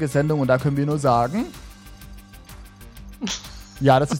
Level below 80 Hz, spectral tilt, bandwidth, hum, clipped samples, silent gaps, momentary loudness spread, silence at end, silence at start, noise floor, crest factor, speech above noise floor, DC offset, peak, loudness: -44 dBFS; -6 dB/octave; 16.5 kHz; none; under 0.1%; none; 24 LU; 0 s; 0 s; -42 dBFS; 20 dB; 22 dB; under 0.1%; -4 dBFS; -22 LUFS